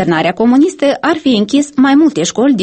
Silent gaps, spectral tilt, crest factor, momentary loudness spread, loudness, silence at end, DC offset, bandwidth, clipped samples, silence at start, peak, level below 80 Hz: none; -5 dB/octave; 10 dB; 4 LU; -11 LUFS; 0 s; under 0.1%; 8.8 kHz; under 0.1%; 0 s; 0 dBFS; -52 dBFS